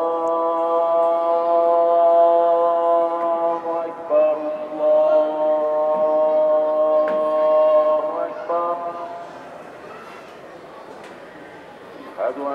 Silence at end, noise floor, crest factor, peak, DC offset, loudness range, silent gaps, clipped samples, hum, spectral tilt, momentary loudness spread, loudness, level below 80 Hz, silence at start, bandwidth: 0 s; -39 dBFS; 12 dB; -6 dBFS; under 0.1%; 14 LU; none; under 0.1%; none; -6 dB/octave; 23 LU; -19 LUFS; -74 dBFS; 0 s; 5.2 kHz